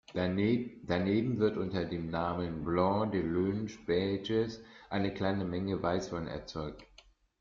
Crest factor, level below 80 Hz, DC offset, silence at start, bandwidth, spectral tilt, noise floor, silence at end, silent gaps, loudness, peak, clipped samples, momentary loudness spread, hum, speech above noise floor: 18 dB; -58 dBFS; under 0.1%; 0.1 s; 7.4 kHz; -7.5 dB/octave; -62 dBFS; 0.55 s; none; -33 LUFS; -14 dBFS; under 0.1%; 9 LU; none; 30 dB